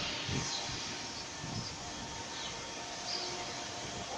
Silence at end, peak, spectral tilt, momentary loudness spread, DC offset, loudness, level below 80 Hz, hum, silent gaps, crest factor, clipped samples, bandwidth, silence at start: 0 s; -20 dBFS; -2.5 dB/octave; 6 LU; under 0.1%; -38 LUFS; -58 dBFS; none; none; 20 dB; under 0.1%; 15.5 kHz; 0 s